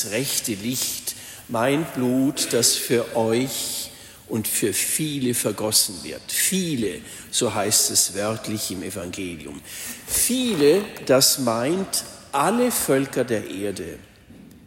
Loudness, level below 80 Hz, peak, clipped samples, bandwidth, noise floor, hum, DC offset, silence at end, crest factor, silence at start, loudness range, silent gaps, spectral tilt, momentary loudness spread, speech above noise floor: -22 LUFS; -56 dBFS; -4 dBFS; under 0.1%; 16.5 kHz; -46 dBFS; none; under 0.1%; 0.1 s; 18 dB; 0 s; 3 LU; none; -3 dB/octave; 13 LU; 23 dB